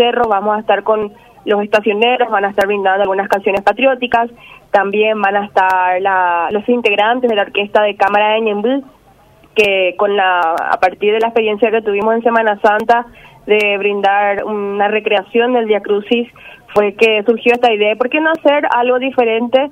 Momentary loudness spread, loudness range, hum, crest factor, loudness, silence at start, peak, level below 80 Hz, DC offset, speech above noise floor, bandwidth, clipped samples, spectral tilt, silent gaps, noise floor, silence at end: 5 LU; 1 LU; none; 14 dB; -13 LUFS; 0 s; 0 dBFS; -54 dBFS; under 0.1%; 33 dB; 15 kHz; under 0.1%; -5 dB/octave; none; -46 dBFS; 0 s